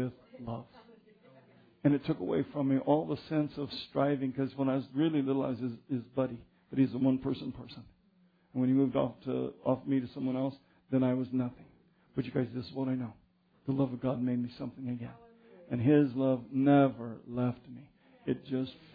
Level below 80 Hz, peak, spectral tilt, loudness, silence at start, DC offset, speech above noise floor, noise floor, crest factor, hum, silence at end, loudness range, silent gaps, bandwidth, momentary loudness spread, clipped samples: -66 dBFS; -14 dBFS; -10.5 dB/octave; -32 LUFS; 0 s; under 0.1%; 36 dB; -67 dBFS; 18 dB; none; 0.2 s; 5 LU; none; 5 kHz; 14 LU; under 0.1%